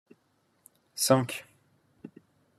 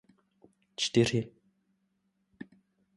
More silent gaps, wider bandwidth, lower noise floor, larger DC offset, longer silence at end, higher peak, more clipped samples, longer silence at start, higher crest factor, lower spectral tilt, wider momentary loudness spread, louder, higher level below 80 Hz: neither; first, 13.5 kHz vs 11.5 kHz; second, -71 dBFS vs -77 dBFS; neither; about the same, 0.5 s vs 0.55 s; first, -6 dBFS vs -12 dBFS; neither; first, 0.95 s vs 0.8 s; about the same, 26 dB vs 24 dB; about the same, -4 dB/octave vs -5 dB/octave; about the same, 26 LU vs 24 LU; about the same, -27 LUFS vs -29 LUFS; second, -74 dBFS vs -66 dBFS